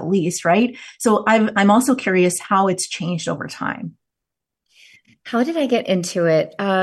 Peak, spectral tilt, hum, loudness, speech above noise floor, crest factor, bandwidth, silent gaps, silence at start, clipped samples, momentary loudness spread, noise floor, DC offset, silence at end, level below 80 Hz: -4 dBFS; -5 dB/octave; none; -18 LUFS; 65 dB; 16 dB; 12.5 kHz; none; 0 s; under 0.1%; 11 LU; -84 dBFS; under 0.1%; 0 s; -64 dBFS